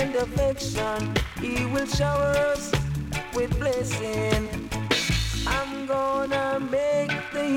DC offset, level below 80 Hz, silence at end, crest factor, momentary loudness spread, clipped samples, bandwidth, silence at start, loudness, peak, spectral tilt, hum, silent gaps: under 0.1%; -36 dBFS; 0 s; 18 dB; 5 LU; under 0.1%; 17.5 kHz; 0 s; -26 LUFS; -8 dBFS; -5 dB/octave; none; none